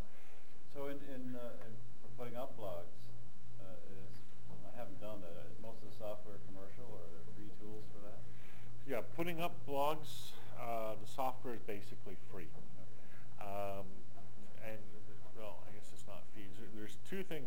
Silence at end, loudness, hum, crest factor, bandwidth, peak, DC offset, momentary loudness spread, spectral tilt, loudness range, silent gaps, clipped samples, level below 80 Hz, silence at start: 0 s; -48 LUFS; none; 24 dB; 17 kHz; -20 dBFS; 3%; 17 LU; -6 dB/octave; 10 LU; none; under 0.1%; -72 dBFS; 0 s